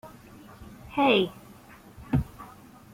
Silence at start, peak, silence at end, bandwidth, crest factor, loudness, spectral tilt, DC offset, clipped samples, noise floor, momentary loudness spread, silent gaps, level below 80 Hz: 0.05 s; -8 dBFS; 0.45 s; 16.5 kHz; 22 dB; -26 LUFS; -6.5 dB/octave; under 0.1%; under 0.1%; -50 dBFS; 27 LU; none; -48 dBFS